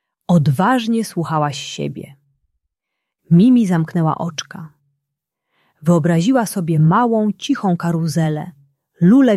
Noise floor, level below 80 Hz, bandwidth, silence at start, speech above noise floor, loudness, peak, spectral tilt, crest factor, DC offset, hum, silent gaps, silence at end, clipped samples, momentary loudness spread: -79 dBFS; -58 dBFS; 13 kHz; 0.3 s; 64 dB; -16 LUFS; -2 dBFS; -7 dB/octave; 14 dB; under 0.1%; none; none; 0 s; under 0.1%; 13 LU